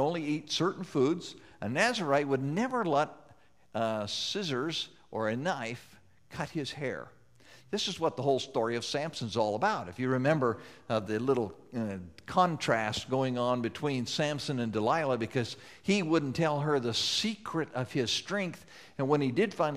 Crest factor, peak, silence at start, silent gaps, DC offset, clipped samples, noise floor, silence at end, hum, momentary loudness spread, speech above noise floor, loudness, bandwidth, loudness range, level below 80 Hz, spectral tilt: 20 dB; -12 dBFS; 0 s; none; under 0.1%; under 0.1%; -62 dBFS; 0 s; none; 10 LU; 31 dB; -31 LUFS; 15 kHz; 4 LU; -68 dBFS; -5 dB/octave